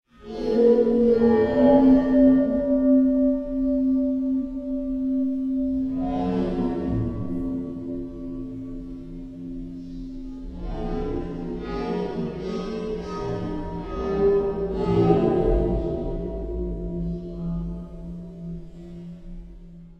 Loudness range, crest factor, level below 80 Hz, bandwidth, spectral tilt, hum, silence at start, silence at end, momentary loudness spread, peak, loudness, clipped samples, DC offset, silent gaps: 14 LU; 18 dB; -36 dBFS; 6 kHz; -9.5 dB/octave; none; 0.2 s; 0.05 s; 19 LU; -6 dBFS; -23 LUFS; under 0.1%; 0.1%; none